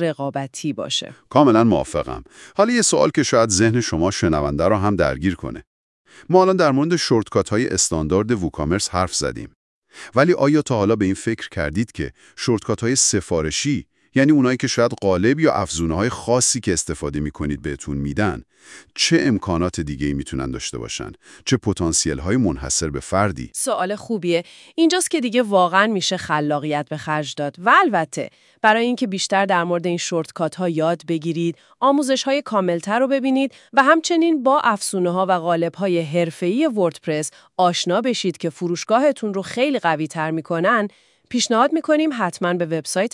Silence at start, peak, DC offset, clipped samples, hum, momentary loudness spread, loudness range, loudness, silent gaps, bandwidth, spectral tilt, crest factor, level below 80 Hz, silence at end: 0 s; 0 dBFS; under 0.1%; under 0.1%; none; 10 LU; 4 LU; -19 LUFS; 5.67-6.05 s, 9.55-9.82 s; 12 kHz; -4.5 dB/octave; 20 dB; -44 dBFS; 0.05 s